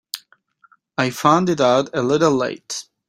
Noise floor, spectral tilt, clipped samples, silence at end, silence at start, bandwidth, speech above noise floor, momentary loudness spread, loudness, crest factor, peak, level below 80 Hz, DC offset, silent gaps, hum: -57 dBFS; -5 dB/octave; under 0.1%; 0.25 s; 0.15 s; 16 kHz; 40 dB; 14 LU; -18 LUFS; 18 dB; -2 dBFS; -60 dBFS; under 0.1%; none; none